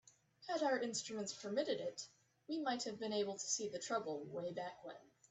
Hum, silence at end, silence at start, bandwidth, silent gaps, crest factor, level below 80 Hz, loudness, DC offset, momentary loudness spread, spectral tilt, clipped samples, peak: none; 0.3 s; 0.05 s; 8.4 kHz; none; 18 dB; -86 dBFS; -42 LUFS; under 0.1%; 14 LU; -2.5 dB/octave; under 0.1%; -26 dBFS